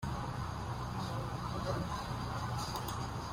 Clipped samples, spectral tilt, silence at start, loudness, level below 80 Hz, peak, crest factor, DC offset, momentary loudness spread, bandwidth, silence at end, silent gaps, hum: under 0.1%; -5.5 dB/octave; 0 s; -39 LUFS; -50 dBFS; -24 dBFS; 14 dB; under 0.1%; 3 LU; 16 kHz; 0 s; none; none